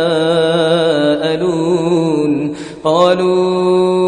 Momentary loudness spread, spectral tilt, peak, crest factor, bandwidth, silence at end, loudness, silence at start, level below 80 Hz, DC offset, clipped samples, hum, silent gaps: 5 LU; -6 dB/octave; 0 dBFS; 12 dB; 10 kHz; 0 s; -14 LUFS; 0 s; -52 dBFS; under 0.1%; under 0.1%; none; none